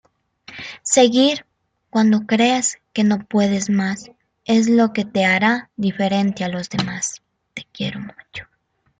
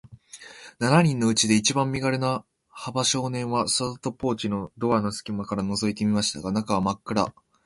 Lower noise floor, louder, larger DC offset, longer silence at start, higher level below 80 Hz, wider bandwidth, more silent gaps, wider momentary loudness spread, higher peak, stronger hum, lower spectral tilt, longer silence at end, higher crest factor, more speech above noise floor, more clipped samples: about the same, -47 dBFS vs -46 dBFS; first, -18 LUFS vs -25 LUFS; neither; first, 0.5 s vs 0.1 s; second, -60 dBFS vs -54 dBFS; second, 9.6 kHz vs 11.5 kHz; neither; first, 19 LU vs 11 LU; first, -2 dBFS vs -6 dBFS; neither; about the same, -4 dB/octave vs -4.5 dB/octave; first, 0.55 s vs 0.35 s; about the same, 18 dB vs 20 dB; first, 28 dB vs 22 dB; neither